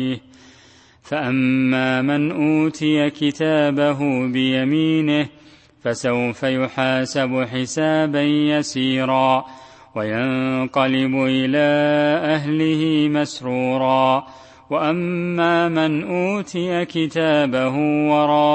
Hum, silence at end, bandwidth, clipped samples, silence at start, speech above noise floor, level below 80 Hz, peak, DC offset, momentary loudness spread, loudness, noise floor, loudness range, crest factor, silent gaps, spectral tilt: none; 0 s; 8.6 kHz; under 0.1%; 0 s; 31 dB; -60 dBFS; -2 dBFS; under 0.1%; 6 LU; -19 LUFS; -50 dBFS; 2 LU; 16 dB; none; -6 dB/octave